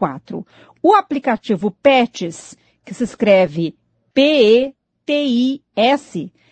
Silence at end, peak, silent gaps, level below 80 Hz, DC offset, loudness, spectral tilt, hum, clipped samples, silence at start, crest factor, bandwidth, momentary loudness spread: 0.25 s; 0 dBFS; none; -60 dBFS; under 0.1%; -16 LUFS; -5.5 dB/octave; none; under 0.1%; 0 s; 16 dB; 9 kHz; 16 LU